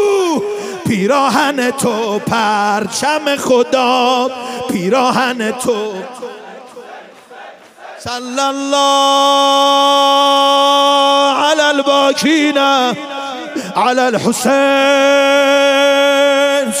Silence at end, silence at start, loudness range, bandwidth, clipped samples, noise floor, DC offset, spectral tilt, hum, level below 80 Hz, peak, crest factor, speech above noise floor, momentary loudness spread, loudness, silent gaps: 0 s; 0 s; 8 LU; 16 kHz; under 0.1%; -35 dBFS; under 0.1%; -3 dB/octave; none; -60 dBFS; 0 dBFS; 12 dB; 23 dB; 13 LU; -12 LUFS; none